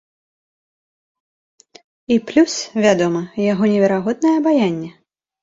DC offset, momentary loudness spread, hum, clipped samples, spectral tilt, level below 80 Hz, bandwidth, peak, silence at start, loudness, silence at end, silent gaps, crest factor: under 0.1%; 5 LU; none; under 0.1%; -5.5 dB/octave; -60 dBFS; 7.8 kHz; -2 dBFS; 2.1 s; -17 LUFS; 0.55 s; none; 18 dB